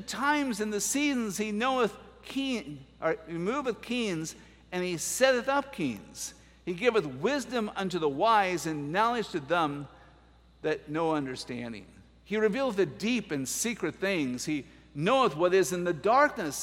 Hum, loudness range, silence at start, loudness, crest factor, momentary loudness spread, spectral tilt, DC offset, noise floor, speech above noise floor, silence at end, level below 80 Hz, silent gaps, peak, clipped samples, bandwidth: none; 4 LU; 0 s; -29 LUFS; 22 dB; 13 LU; -4 dB/octave; under 0.1%; -58 dBFS; 29 dB; 0 s; -60 dBFS; none; -8 dBFS; under 0.1%; 16 kHz